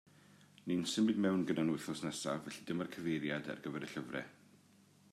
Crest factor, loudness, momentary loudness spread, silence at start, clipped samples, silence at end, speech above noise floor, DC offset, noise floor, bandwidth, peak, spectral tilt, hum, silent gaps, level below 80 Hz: 18 dB; -38 LUFS; 10 LU; 0.3 s; under 0.1%; 0.55 s; 29 dB; under 0.1%; -66 dBFS; 14 kHz; -22 dBFS; -5 dB/octave; none; none; -78 dBFS